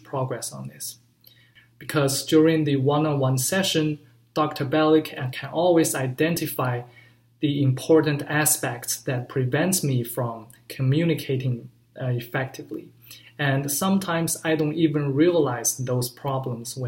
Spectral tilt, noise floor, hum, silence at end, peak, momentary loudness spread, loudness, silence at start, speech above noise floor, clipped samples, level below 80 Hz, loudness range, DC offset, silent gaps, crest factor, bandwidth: -5 dB/octave; -56 dBFS; none; 0 s; -6 dBFS; 13 LU; -23 LUFS; 0.1 s; 33 dB; under 0.1%; -64 dBFS; 4 LU; under 0.1%; none; 18 dB; 16.5 kHz